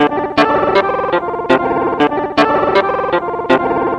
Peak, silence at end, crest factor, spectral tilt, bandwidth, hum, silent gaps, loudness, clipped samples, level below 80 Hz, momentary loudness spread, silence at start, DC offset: 0 dBFS; 0 s; 14 dB; -6 dB/octave; 11 kHz; none; none; -14 LUFS; 0.1%; -44 dBFS; 4 LU; 0 s; under 0.1%